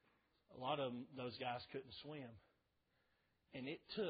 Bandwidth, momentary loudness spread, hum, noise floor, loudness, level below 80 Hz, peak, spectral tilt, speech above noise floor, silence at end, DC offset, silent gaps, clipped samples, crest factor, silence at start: 5 kHz; 14 LU; none; -83 dBFS; -49 LUFS; -82 dBFS; -28 dBFS; -3.5 dB/octave; 36 dB; 0 s; under 0.1%; none; under 0.1%; 22 dB; 0.5 s